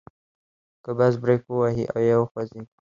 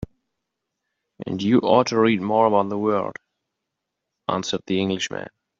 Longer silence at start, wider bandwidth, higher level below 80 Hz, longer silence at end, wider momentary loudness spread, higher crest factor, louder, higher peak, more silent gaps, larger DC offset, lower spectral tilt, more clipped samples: first, 0.85 s vs 0 s; about the same, 7.2 kHz vs 7.6 kHz; about the same, -58 dBFS vs -56 dBFS; about the same, 0.25 s vs 0.3 s; about the same, 13 LU vs 15 LU; about the same, 18 dB vs 20 dB; about the same, -23 LUFS vs -21 LUFS; about the same, -6 dBFS vs -4 dBFS; first, 2.31-2.35 s vs none; neither; first, -9 dB/octave vs -4.5 dB/octave; neither